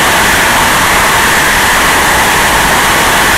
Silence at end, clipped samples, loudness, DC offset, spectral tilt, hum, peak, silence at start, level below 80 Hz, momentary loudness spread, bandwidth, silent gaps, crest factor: 0 s; under 0.1%; -6 LUFS; under 0.1%; -1.5 dB/octave; none; 0 dBFS; 0 s; -26 dBFS; 0 LU; 16.5 kHz; none; 8 dB